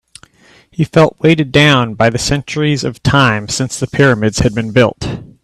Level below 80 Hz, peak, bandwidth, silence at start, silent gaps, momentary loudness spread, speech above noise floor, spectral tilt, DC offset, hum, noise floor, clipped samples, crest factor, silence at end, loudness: -36 dBFS; 0 dBFS; 13 kHz; 0.8 s; none; 8 LU; 35 dB; -5 dB/octave; under 0.1%; none; -47 dBFS; under 0.1%; 14 dB; 0.15 s; -12 LUFS